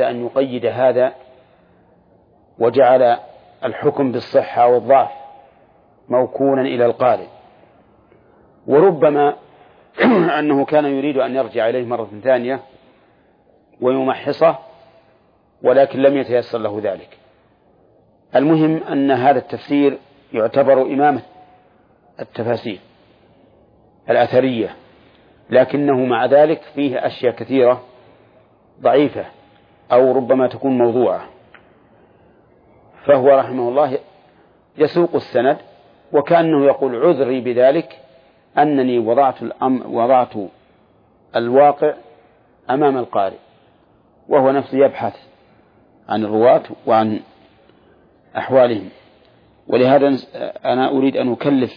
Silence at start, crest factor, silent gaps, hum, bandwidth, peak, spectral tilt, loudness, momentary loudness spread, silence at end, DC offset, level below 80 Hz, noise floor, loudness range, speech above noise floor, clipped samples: 0 s; 16 dB; none; none; 5.2 kHz; -2 dBFS; -9.5 dB/octave; -16 LUFS; 12 LU; 0.05 s; under 0.1%; -64 dBFS; -55 dBFS; 4 LU; 40 dB; under 0.1%